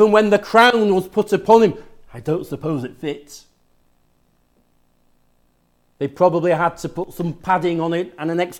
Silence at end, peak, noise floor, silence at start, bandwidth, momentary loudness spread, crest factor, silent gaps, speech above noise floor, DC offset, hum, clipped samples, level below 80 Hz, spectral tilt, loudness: 0 s; 0 dBFS; -61 dBFS; 0 s; 16.5 kHz; 15 LU; 18 dB; none; 44 dB; under 0.1%; 50 Hz at -55 dBFS; under 0.1%; -54 dBFS; -6 dB/octave; -18 LUFS